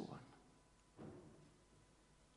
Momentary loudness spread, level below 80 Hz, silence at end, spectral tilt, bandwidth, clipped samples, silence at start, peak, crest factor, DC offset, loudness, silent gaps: 12 LU; -76 dBFS; 0 s; -6 dB/octave; 10.5 kHz; under 0.1%; 0 s; -38 dBFS; 22 dB; under 0.1%; -61 LUFS; none